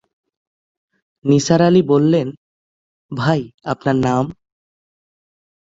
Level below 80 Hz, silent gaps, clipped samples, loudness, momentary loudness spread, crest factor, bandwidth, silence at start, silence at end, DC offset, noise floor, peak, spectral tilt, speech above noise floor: -52 dBFS; 2.37-3.09 s, 3.54-3.58 s; under 0.1%; -17 LUFS; 13 LU; 18 dB; 7.8 kHz; 1.25 s; 1.45 s; under 0.1%; under -90 dBFS; -2 dBFS; -6.5 dB/octave; over 75 dB